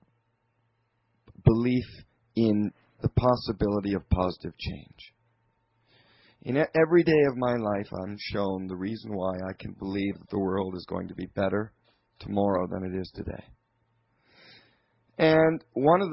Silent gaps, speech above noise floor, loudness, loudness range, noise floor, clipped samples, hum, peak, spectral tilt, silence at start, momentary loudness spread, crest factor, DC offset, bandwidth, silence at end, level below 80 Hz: none; 46 dB; -27 LUFS; 6 LU; -73 dBFS; under 0.1%; none; -8 dBFS; -11 dB/octave; 1.45 s; 15 LU; 20 dB; under 0.1%; 5.8 kHz; 0 s; -46 dBFS